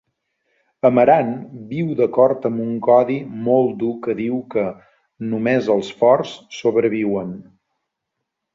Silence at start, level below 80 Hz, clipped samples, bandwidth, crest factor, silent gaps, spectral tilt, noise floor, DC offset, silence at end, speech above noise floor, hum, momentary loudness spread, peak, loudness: 0.85 s; -62 dBFS; under 0.1%; 7.6 kHz; 18 dB; none; -7.5 dB/octave; -79 dBFS; under 0.1%; 1.1 s; 61 dB; none; 11 LU; -2 dBFS; -18 LUFS